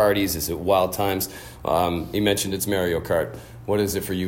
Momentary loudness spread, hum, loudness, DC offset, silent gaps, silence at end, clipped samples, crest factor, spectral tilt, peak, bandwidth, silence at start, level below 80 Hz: 7 LU; none; -23 LUFS; under 0.1%; none; 0 s; under 0.1%; 16 dB; -4.5 dB/octave; -6 dBFS; 17 kHz; 0 s; -46 dBFS